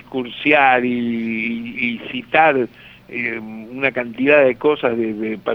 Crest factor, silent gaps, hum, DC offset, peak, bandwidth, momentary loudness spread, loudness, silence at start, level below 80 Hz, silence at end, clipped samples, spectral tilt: 18 dB; none; none; under 0.1%; 0 dBFS; 5.8 kHz; 13 LU; -18 LUFS; 0.1 s; -58 dBFS; 0 s; under 0.1%; -7.5 dB/octave